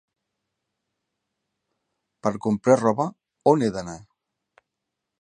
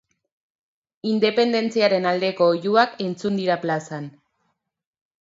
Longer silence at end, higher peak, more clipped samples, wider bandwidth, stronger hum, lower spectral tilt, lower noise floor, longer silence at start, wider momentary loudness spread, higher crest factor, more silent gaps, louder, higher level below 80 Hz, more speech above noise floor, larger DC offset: first, 1.25 s vs 1.1 s; about the same, -4 dBFS vs -2 dBFS; neither; first, 10 kHz vs 7.8 kHz; neither; first, -7 dB/octave vs -5.5 dB/octave; first, -83 dBFS vs -73 dBFS; first, 2.25 s vs 1.05 s; first, 15 LU vs 11 LU; about the same, 24 dB vs 20 dB; neither; about the same, -23 LUFS vs -21 LUFS; first, -62 dBFS vs -72 dBFS; first, 62 dB vs 52 dB; neither